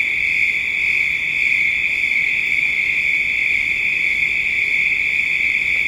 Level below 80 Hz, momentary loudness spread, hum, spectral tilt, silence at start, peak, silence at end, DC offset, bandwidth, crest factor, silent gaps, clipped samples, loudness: -48 dBFS; 1 LU; none; -1 dB/octave; 0 s; -6 dBFS; 0 s; under 0.1%; 16 kHz; 12 dB; none; under 0.1%; -15 LUFS